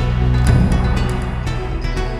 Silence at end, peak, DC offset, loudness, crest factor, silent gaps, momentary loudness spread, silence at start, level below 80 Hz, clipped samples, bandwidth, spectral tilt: 0 s; -2 dBFS; under 0.1%; -18 LUFS; 14 dB; none; 9 LU; 0 s; -20 dBFS; under 0.1%; 12.5 kHz; -7 dB/octave